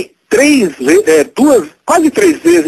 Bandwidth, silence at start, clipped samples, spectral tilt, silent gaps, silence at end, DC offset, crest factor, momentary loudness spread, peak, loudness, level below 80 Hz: 13.5 kHz; 0 s; 0.3%; -3.5 dB/octave; none; 0 s; under 0.1%; 10 dB; 4 LU; 0 dBFS; -10 LUFS; -50 dBFS